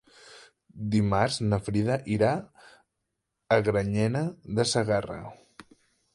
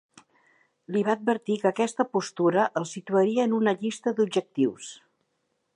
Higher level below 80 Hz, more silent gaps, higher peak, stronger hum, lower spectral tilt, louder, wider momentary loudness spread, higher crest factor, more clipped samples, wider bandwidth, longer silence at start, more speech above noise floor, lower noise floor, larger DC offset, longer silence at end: first, -52 dBFS vs -80 dBFS; neither; about the same, -6 dBFS vs -8 dBFS; neither; about the same, -6 dB/octave vs -5.5 dB/octave; about the same, -27 LUFS vs -26 LUFS; first, 10 LU vs 5 LU; about the same, 22 dB vs 18 dB; neither; about the same, 11.5 kHz vs 10.5 kHz; second, 0.25 s vs 0.9 s; first, 56 dB vs 50 dB; first, -82 dBFS vs -76 dBFS; neither; about the same, 0.8 s vs 0.8 s